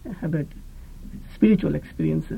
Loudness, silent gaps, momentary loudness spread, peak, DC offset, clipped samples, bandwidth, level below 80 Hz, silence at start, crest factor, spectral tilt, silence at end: -23 LUFS; none; 23 LU; -6 dBFS; under 0.1%; under 0.1%; 8.8 kHz; -40 dBFS; 0.05 s; 18 dB; -9.5 dB/octave; 0 s